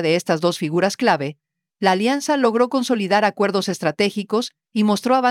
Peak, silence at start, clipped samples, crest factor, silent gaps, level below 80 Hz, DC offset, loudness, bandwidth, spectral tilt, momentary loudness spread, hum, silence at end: -4 dBFS; 0 s; under 0.1%; 16 dB; none; -70 dBFS; under 0.1%; -19 LUFS; 15.5 kHz; -5 dB/octave; 6 LU; none; 0 s